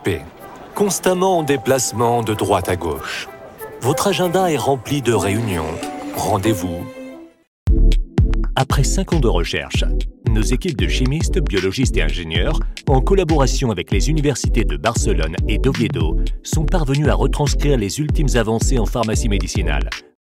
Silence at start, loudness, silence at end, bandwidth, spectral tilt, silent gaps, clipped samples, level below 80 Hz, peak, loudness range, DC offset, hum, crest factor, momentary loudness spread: 0 s; -19 LUFS; 0.2 s; 17 kHz; -5 dB/octave; 7.47-7.66 s; under 0.1%; -22 dBFS; -4 dBFS; 2 LU; under 0.1%; none; 14 dB; 8 LU